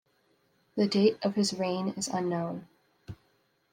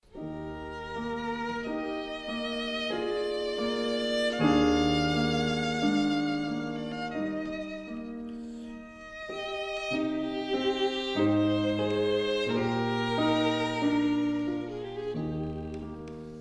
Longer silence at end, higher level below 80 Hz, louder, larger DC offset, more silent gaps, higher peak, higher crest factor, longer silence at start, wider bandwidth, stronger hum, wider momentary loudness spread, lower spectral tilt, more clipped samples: first, 0.6 s vs 0 s; second, -70 dBFS vs -52 dBFS; about the same, -29 LUFS vs -30 LUFS; neither; neither; about the same, -12 dBFS vs -12 dBFS; about the same, 20 dB vs 18 dB; first, 0.75 s vs 0.15 s; first, 15 kHz vs 11 kHz; neither; first, 24 LU vs 13 LU; about the same, -5 dB/octave vs -5.5 dB/octave; neither